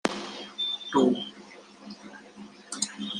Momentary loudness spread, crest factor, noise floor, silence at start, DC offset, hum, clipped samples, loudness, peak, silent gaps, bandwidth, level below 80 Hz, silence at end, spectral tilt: 23 LU; 28 dB; -49 dBFS; 0.05 s; under 0.1%; none; under 0.1%; -29 LUFS; -2 dBFS; none; 12 kHz; -72 dBFS; 0 s; -3 dB/octave